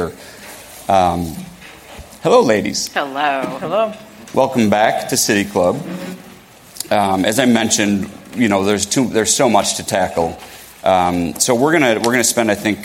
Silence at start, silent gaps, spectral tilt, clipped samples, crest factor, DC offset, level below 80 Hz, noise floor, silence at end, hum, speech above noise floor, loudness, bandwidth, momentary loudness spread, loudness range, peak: 0 s; none; -3.5 dB/octave; under 0.1%; 16 dB; under 0.1%; -48 dBFS; -41 dBFS; 0 s; none; 25 dB; -16 LUFS; 17 kHz; 19 LU; 3 LU; 0 dBFS